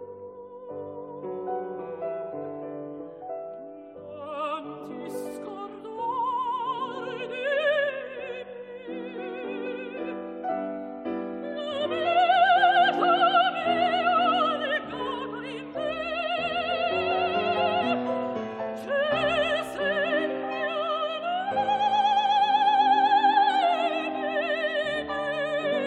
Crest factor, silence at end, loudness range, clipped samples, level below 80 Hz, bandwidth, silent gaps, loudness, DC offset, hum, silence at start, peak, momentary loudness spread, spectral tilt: 16 dB; 0 s; 13 LU; under 0.1%; -64 dBFS; 10.5 kHz; none; -26 LUFS; under 0.1%; none; 0 s; -10 dBFS; 17 LU; -4.5 dB/octave